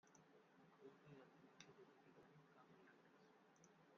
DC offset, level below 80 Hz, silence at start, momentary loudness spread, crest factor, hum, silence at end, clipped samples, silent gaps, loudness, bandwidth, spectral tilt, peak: under 0.1%; under -90 dBFS; 0.05 s; 3 LU; 26 dB; none; 0 s; under 0.1%; none; -67 LUFS; 7 kHz; -4 dB/octave; -44 dBFS